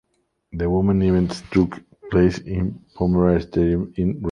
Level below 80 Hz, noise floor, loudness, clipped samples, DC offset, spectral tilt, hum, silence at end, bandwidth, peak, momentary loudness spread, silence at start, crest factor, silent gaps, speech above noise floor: -36 dBFS; -61 dBFS; -21 LUFS; under 0.1%; under 0.1%; -8.5 dB/octave; none; 0 s; 10 kHz; -4 dBFS; 8 LU; 0.55 s; 16 dB; none; 42 dB